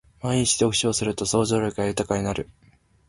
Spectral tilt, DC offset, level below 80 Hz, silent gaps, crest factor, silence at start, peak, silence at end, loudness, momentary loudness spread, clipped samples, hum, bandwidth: -4 dB/octave; under 0.1%; -48 dBFS; none; 18 dB; 0.25 s; -6 dBFS; 0.65 s; -23 LUFS; 8 LU; under 0.1%; none; 11.5 kHz